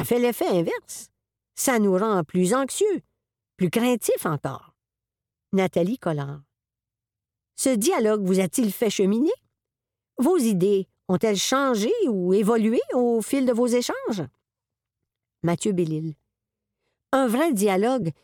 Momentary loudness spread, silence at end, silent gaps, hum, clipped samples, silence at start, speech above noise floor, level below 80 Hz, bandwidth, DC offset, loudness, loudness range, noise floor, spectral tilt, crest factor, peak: 11 LU; 0.1 s; none; none; under 0.1%; 0 s; 67 dB; -66 dBFS; 19 kHz; under 0.1%; -23 LUFS; 6 LU; -89 dBFS; -5 dB/octave; 16 dB; -8 dBFS